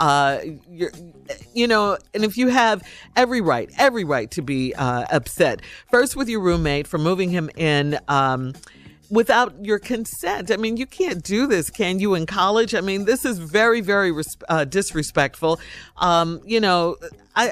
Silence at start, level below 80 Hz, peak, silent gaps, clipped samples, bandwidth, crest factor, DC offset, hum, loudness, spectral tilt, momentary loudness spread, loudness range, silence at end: 0 s; -44 dBFS; -6 dBFS; none; under 0.1%; 16 kHz; 14 dB; under 0.1%; none; -20 LUFS; -4.5 dB/octave; 9 LU; 2 LU; 0 s